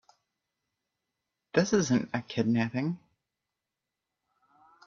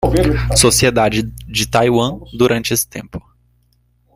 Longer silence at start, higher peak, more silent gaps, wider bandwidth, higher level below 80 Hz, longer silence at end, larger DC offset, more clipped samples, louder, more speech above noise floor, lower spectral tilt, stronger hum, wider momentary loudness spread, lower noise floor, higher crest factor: first, 1.55 s vs 0 s; second, -10 dBFS vs 0 dBFS; neither; second, 7.4 kHz vs 16 kHz; second, -68 dBFS vs -28 dBFS; first, 1.9 s vs 0.95 s; neither; neither; second, -29 LUFS vs -15 LUFS; first, 60 dB vs 43 dB; first, -5.5 dB/octave vs -4 dB/octave; second, none vs 60 Hz at -30 dBFS; second, 8 LU vs 12 LU; first, -88 dBFS vs -58 dBFS; first, 24 dB vs 16 dB